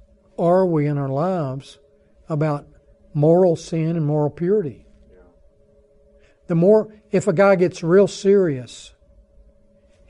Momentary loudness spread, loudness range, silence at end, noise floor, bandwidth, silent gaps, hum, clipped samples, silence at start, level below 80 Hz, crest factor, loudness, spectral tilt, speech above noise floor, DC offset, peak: 14 LU; 4 LU; 1.2 s; -55 dBFS; 10.5 kHz; none; none; under 0.1%; 0.4 s; -54 dBFS; 16 dB; -19 LUFS; -7.5 dB/octave; 37 dB; under 0.1%; -4 dBFS